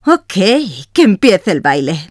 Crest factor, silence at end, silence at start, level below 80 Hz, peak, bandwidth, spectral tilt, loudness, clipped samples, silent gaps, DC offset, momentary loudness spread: 12 dB; 0.05 s; 0.05 s; -52 dBFS; 0 dBFS; 11 kHz; -5.5 dB/octave; -12 LUFS; 0.4%; none; under 0.1%; 7 LU